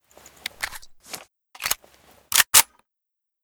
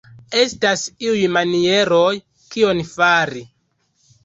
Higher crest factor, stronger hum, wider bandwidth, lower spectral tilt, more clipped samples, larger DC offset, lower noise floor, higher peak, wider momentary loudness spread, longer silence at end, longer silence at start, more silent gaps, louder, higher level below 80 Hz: first, 26 dB vs 16 dB; neither; first, over 20 kHz vs 8.2 kHz; second, 2 dB/octave vs -3.5 dB/octave; neither; neither; first, -83 dBFS vs -65 dBFS; about the same, 0 dBFS vs -2 dBFS; first, 24 LU vs 9 LU; about the same, 0.8 s vs 0.8 s; first, 0.6 s vs 0.3 s; neither; about the same, -19 LUFS vs -17 LUFS; about the same, -56 dBFS vs -56 dBFS